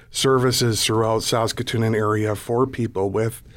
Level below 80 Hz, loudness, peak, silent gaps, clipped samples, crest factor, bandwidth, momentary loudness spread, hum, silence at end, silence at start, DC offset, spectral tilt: -48 dBFS; -21 LUFS; -8 dBFS; none; under 0.1%; 14 dB; 17.5 kHz; 5 LU; none; 0.05 s; 0.1 s; under 0.1%; -4.5 dB/octave